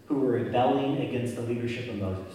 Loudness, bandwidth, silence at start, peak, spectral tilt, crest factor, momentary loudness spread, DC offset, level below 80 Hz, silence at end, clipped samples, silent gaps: -28 LUFS; 14 kHz; 0.1 s; -14 dBFS; -7.5 dB/octave; 14 dB; 8 LU; under 0.1%; -62 dBFS; 0 s; under 0.1%; none